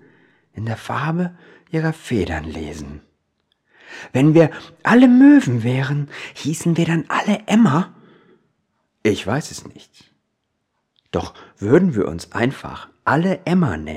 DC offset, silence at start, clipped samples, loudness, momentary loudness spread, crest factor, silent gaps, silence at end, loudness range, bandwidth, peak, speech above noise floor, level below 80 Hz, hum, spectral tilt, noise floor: under 0.1%; 0.55 s; under 0.1%; -18 LUFS; 18 LU; 18 dB; none; 0 s; 11 LU; 14 kHz; -2 dBFS; 55 dB; -48 dBFS; none; -7 dB/octave; -73 dBFS